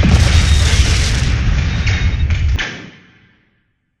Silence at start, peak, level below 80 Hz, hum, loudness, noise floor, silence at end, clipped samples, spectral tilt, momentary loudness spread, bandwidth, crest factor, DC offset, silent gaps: 0 s; 0 dBFS; -16 dBFS; none; -15 LUFS; -63 dBFS; 1.1 s; under 0.1%; -4.5 dB/octave; 7 LU; 12 kHz; 14 dB; under 0.1%; none